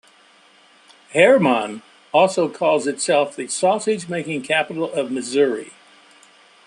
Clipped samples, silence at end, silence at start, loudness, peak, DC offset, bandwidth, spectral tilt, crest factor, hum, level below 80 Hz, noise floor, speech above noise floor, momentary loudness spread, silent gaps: under 0.1%; 0.95 s; 1.1 s; -19 LUFS; -2 dBFS; under 0.1%; 11.5 kHz; -4 dB/octave; 18 dB; none; -70 dBFS; -52 dBFS; 34 dB; 11 LU; none